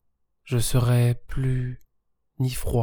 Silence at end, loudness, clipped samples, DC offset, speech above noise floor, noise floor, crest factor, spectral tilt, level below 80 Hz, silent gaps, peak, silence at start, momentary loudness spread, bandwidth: 0 s; -25 LUFS; under 0.1%; under 0.1%; 51 dB; -74 dBFS; 14 dB; -6 dB/octave; -36 dBFS; none; -10 dBFS; 0.45 s; 9 LU; 19.5 kHz